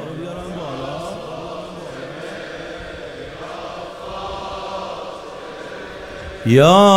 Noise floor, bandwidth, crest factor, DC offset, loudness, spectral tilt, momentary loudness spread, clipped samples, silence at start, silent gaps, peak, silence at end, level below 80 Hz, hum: -33 dBFS; 16 kHz; 20 dB; under 0.1%; -23 LUFS; -5.5 dB/octave; 14 LU; under 0.1%; 0 s; none; 0 dBFS; 0 s; -46 dBFS; none